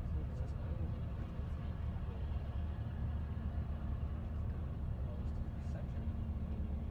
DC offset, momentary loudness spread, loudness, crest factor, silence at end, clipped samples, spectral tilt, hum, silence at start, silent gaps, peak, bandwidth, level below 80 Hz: under 0.1%; 2 LU; -42 LUFS; 12 dB; 0 s; under 0.1%; -9.5 dB/octave; none; 0 s; none; -28 dBFS; 4.6 kHz; -42 dBFS